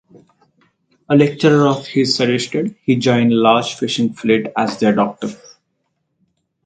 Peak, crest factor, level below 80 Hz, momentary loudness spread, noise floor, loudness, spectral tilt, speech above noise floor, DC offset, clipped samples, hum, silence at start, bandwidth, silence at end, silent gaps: 0 dBFS; 16 dB; -60 dBFS; 8 LU; -70 dBFS; -16 LUFS; -5.5 dB/octave; 55 dB; under 0.1%; under 0.1%; none; 1.1 s; 9.2 kHz; 1.3 s; none